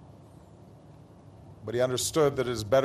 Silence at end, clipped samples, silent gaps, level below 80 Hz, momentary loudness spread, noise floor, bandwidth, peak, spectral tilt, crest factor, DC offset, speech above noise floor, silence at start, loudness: 0 s; under 0.1%; none; -56 dBFS; 9 LU; -52 dBFS; 14 kHz; -10 dBFS; -4.5 dB/octave; 20 dB; under 0.1%; 26 dB; 0.2 s; -27 LUFS